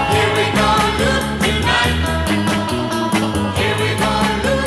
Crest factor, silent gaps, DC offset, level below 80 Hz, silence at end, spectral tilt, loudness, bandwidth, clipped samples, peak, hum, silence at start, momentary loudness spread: 12 dB; none; under 0.1%; -30 dBFS; 0 s; -4.5 dB/octave; -16 LUFS; 15.5 kHz; under 0.1%; -4 dBFS; none; 0 s; 4 LU